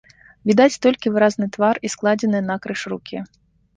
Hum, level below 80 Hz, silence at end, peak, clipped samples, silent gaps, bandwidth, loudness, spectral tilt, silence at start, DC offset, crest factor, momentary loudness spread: none; -60 dBFS; 0.5 s; -2 dBFS; under 0.1%; none; 9.6 kHz; -19 LUFS; -5 dB/octave; 0.45 s; under 0.1%; 18 dB; 14 LU